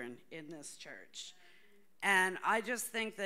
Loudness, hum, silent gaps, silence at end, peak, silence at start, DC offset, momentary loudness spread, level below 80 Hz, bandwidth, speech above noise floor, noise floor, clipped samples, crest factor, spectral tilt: -33 LUFS; none; none; 0 s; -16 dBFS; 0 s; under 0.1%; 20 LU; -82 dBFS; 16 kHz; 30 dB; -67 dBFS; under 0.1%; 22 dB; -2 dB/octave